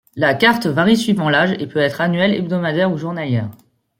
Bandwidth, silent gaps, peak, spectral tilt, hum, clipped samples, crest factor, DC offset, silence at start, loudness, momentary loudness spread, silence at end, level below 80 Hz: 16.5 kHz; none; 0 dBFS; -6 dB/octave; none; under 0.1%; 16 dB; under 0.1%; 0.15 s; -17 LUFS; 7 LU; 0.45 s; -58 dBFS